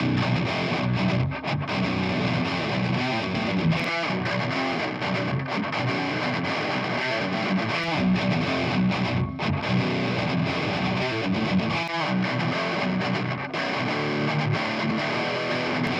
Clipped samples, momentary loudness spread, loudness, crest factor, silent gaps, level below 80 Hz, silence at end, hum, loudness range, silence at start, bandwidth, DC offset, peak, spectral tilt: under 0.1%; 3 LU; -25 LUFS; 14 dB; none; -52 dBFS; 0 s; none; 1 LU; 0 s; 9.8 kHz; under 0.1%; -12 dBFS; -6.5 dB/octave